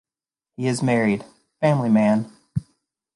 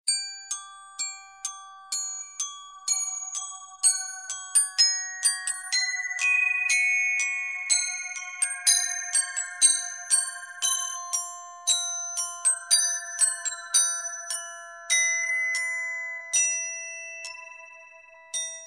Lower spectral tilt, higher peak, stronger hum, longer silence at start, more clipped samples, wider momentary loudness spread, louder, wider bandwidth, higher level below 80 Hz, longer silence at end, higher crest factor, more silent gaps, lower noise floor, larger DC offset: first, -7 dB/octave vs 6 dB/octave; about the same, -6 dBFS vs -6 dBFS; neither; first, 0.6 s vs 0.05 s; neither; about the same, 13 LU vs 14 LU; about the same, -22 LUFS vs -24 LUFS; second, 11.5 kHz vs 14.5 kHz; first, -56 dBFS vs -82 dBFS; first, 0.55 s vs 0 s; second, 16 dB vs 22 dB; neither; first, under -90 dBFS vs -50 dBFS; neither